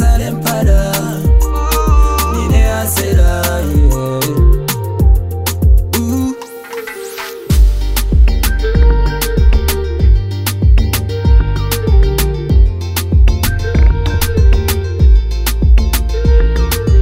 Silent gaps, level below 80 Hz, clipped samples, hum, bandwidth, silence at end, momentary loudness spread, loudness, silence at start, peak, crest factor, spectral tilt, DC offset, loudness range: none; -12 dBFS; under 0.1%; none; 16.5 kHz; 0 s; 5 LU; -13 LUFS; 0 s; 0 dBFS; 10 dB; -5.5 dB/octave; under 0.1%; 2 LU